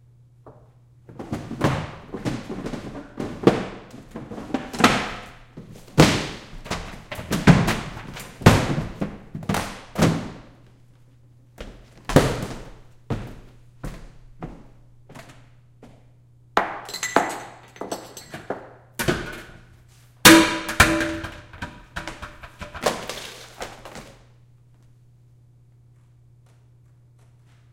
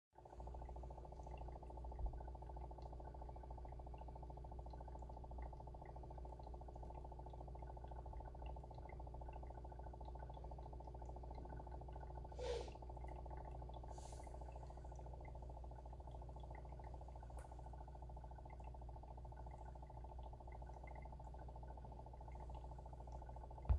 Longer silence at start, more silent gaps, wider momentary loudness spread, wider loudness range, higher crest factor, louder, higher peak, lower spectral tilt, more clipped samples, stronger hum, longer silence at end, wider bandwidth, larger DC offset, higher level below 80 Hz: first, 0.45 s vs 0.15 s; neither; first, 23 LU vs 2 LU; first, 15 LU vs 3 LU; about the same, 26 dB vs 26 dB; first, -22 LUFS vs -55 LUFS; first, 0 dBFS vs -26 dBFS; second, -4.5 dB/octave vs -7 dB/octave; neither; second, none vs 60 Hz at -55 dBFS; first, 3.6 s vs 0 s; first, 17 kHz vs 11 kHz; neither; first, -40 dBFS vs -54 dBFS